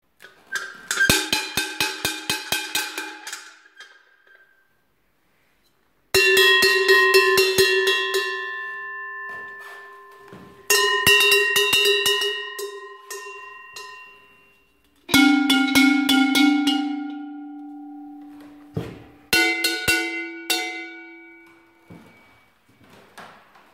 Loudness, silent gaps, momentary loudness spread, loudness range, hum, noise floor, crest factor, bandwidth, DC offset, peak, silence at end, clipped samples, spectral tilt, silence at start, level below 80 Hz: -18 LUFS; none; 23 LU; 11 LU; none; -67 dBFS; 22 dB; 16.5 kHz; under 0.1%; 0 dBFS; 0.45 s; under 0.1%; -2 dB/octave; 0.5 s; -56 dBFS